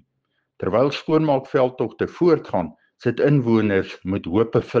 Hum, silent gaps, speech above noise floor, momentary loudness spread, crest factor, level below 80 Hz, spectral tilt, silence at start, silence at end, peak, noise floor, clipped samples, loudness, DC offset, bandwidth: none; none; 53 dB; 8 LU; 16 dB; -56 dBFS; -8.5 dB/octave; 0.6 s; 0 s; -6 dBFS; -73 dBFS; under 0.1%; -21 LUFS; under 0.1%; 7.4 kHz